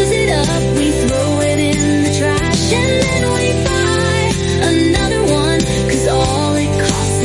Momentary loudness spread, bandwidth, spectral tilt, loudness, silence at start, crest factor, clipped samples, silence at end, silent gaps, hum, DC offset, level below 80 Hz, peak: 2 LU; 11.5 kHz; -4.5 dB/octave; -14 LUFS; 0 s; 12 dB; under 0.1%; 0 s; none; none; under 0.1%; -28 dBFS; -2 dBFS